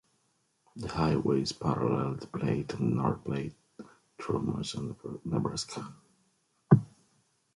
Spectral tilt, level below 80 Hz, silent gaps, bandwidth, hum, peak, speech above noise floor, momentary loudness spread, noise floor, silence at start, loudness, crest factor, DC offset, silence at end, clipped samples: -6.5 dB/octave; -56 dBFS; none; 11.5 kHz; none; -6 dBFS; 42 dB; 17 LU; -74 dBFS; 0.75 s; -31 LUFS; 26 dB; under 0.1%; 0.7 s; under 0.1%